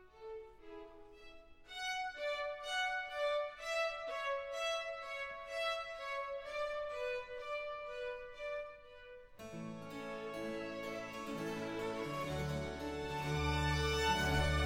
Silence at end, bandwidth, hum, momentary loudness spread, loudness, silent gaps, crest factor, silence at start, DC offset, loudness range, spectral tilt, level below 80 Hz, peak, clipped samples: 0 s; 16.5 kHz; none; 17 LU; -40 LUFS; none; 18 dB; 0 s; under 0.1%; 7 LU; -4.5 dB/octave; -52 dBFS; -22 dBFS; under 0.1%